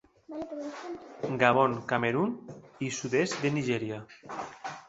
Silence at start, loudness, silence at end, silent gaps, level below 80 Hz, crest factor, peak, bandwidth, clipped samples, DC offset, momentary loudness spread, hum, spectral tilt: 0.3 s; -30 LUFS; 0.05 s; none; -68 dBFS; 24 dB; -6 dBFS; 8.2 kHz; under 0.1%; under 0.1%; 17 LU; none; -5 dB/octave